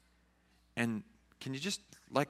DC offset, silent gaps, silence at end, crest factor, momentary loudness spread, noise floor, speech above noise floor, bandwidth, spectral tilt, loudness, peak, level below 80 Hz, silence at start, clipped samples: under 0.1%; none; 0 s; 26 dB; 8 LU; -70 dBFS; 33 dB; 15 kHz; -4.5 dB/octave; -39 LUFS; -14 dBFS; -72 dBFS; 0.75 s; under 0.1%